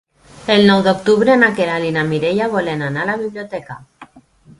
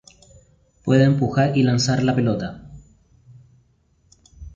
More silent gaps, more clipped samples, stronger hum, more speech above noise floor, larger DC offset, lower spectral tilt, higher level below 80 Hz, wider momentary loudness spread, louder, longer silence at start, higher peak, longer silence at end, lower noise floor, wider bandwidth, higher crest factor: neither; neither; neither; second, 31 dB vs 43 dB; neither; about the same, -6 dB/octave vs -6.5 dB/octave; about the same, -52 dBFS vs -48 dBFS; about the same, 17 LU vs 15 LU; first, -15 LUFS vs -19 LUFS; second, 0.35 s vs 0.85 s; first, 0 dBFS vs -4 dBFS; first, 0.4 s vs 0.05 s; second, -46 dBFS vs -61 dBFS; first, 11.5 kHz vs 7.6 kHz; about the same, 16 dB vs 18 dB